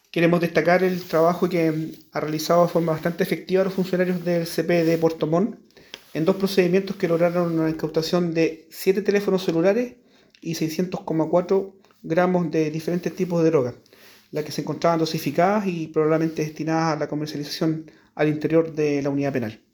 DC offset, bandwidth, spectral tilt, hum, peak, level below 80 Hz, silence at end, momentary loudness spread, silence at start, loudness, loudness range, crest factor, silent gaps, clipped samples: under 0.1%; over 20 kHz; -6.5 dB/octave; none; -4 dBFS; -62 dBFS; 0.2 s; 9 LU; 0.15 s; -23 LUFS; 2 LU; 18 dB; none; under 0.1%